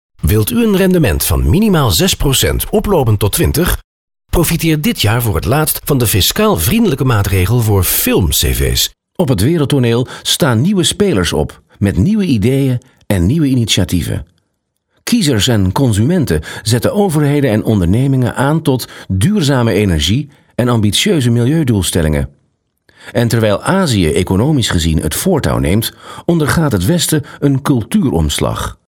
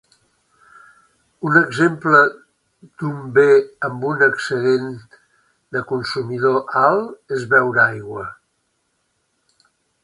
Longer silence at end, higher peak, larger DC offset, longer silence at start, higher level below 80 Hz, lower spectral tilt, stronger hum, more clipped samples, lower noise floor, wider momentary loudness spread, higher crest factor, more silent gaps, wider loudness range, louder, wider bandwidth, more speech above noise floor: second, 0.15 s vs 1.7 s; about the same, 0 dBFS vs 0 dBFS; neither; second, 0.25 s vs 1.4 s; first, -26 dBFS vs -62 dBFS; about the same, -5 dB/octave vs -6 dB/octave; neither; neither; about the same, -67 dBFS vs -69 dBFS; second, 6 LU vs 15 LU; second, 12 dB vs 20 dB; first, 3.84-4.08 s vs none; about the same, 2 LU vs 4 LU; first, -13 LUFS vs -17 LUFS; first, 19 kHz vs 11 kHz; first, 55 dB vs 51 dB